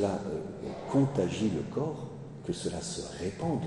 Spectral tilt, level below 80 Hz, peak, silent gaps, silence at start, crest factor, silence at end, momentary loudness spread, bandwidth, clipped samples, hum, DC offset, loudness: -6 dB/octave; -58 dBFS; -14 dBFS; none; 0 s; 18 dB; 0 s; 11 LU; 11 kHz; under 0.1%; none; under 0.1%; -33 LUFS